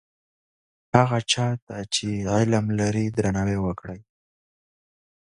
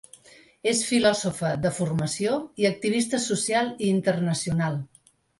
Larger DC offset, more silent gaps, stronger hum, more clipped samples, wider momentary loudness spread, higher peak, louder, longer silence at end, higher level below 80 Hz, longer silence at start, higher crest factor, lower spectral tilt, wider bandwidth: neither; first, 1.62-1.67 s vs none; neither; neither; first, 10 LU vs 6 LU; first, 0 dBFS vs -8 dBFS; about the same, -24 LUFS vs -25 LUFS; first, 1.2 s vs 0.55 s; first, -48 dBFS vs -58 dBFS; first, 0.95 s vs 0.65 s; first, 24 dB vs 18 dB; about the same, -5 dB/octave vs -4.5 dB/octave; about the same, 11 kHz vs 11.5 kHz